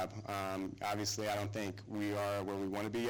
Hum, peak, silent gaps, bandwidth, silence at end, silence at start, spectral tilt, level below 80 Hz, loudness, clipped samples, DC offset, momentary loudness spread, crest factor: none; -26 dBFS; none; over 20 kHz; 0 s; 0 s; -4.5 dB/octave; -68 dBFS; -39 LUFS; under 0.1%; under 0.1%; 4 LU; 12 dB